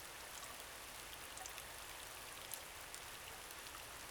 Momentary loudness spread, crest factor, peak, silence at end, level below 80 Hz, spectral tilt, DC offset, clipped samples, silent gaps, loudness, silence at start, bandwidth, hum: 2 LU; 26 dB; -26 dBFS; 0 s; -68 dBFS; -0.5 dB/octave; under 0.1%; under 0.1%; none; -50 LUFS; 0 s; over 20 kHz; none